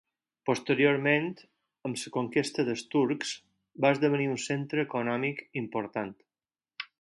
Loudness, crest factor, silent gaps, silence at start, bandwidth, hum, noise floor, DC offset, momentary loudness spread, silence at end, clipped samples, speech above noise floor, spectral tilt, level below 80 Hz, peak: -29 LUFS; 20 dB; none; 0.45 s; 11.5 kHz; none; under -90 dBFS; under 0.1%; 13 LU; 0.15 s; under 0.1%; over 61 dB; -5 dB/octave; -74 dBFS; -10 dBFS